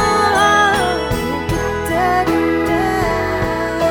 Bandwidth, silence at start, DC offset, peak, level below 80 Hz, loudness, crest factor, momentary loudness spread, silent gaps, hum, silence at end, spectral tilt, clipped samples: over 20 kHz; 0 s; under 0.1%; 0 dBFS; -32 dBFS; -16 LUFS; 14 dB; 7 LU; none; none; 0 s; -4.5 dB/octave; under 0.1%